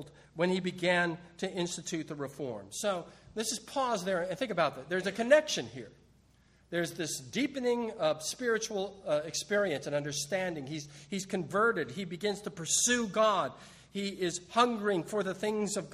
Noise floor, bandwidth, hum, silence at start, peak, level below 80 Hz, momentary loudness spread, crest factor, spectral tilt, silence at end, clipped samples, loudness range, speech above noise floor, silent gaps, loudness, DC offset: -64 dBFS; 15 kHz; none; 0 s; -10 dBFS; -68 dBFS; 11 LU; 22 dB; -3.5 dB/octave; 0 s; under 0.1%; 4 LU; 32 dB; none; -32 LUFS; under 0.1%